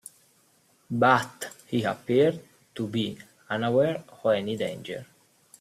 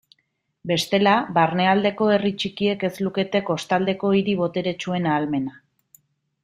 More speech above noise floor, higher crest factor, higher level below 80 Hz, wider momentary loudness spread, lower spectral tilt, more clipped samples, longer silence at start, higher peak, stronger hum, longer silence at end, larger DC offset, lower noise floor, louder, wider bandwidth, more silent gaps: second, 38 dB vs 51 dB; about the same, 20 dB vs 18 dB; second, -68 dBFS vs -62 dBFS; first, 18 LU vs 7 LU; about the same, -5.5 dB/octave vs -5.5 dB/octave; neither; first, 0.9 s vs 0.65 s; second, -8 dBFS vs -4 dBFS; neither; second, 0.55 s vs 0.95 s; neither; second, -64 dBFS vs -72 dBFS; second, -26 LUFS vs -22 LUFS; about the same, 15 kHz vs 15.5 kHz; neither